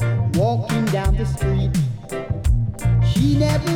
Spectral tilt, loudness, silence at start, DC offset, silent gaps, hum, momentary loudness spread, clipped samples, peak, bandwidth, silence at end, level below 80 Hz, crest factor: -7 dB/octave; -20 LUFS; 0 s; under 0.1%; none; none; 6 LU; under 0.1%; -6 dBFS; 15.5 kHz; 0 s; -26 dBFS; 12 dB